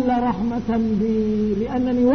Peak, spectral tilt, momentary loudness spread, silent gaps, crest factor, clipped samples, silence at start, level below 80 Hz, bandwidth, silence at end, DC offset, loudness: -8 dBFS; -8.5 dB/octave; 2 LU; none; 12 dB; under 0.1%; 0 s; -40 dBFS; 6.4 kHz; 0 s; 0.6%; -21 LUFS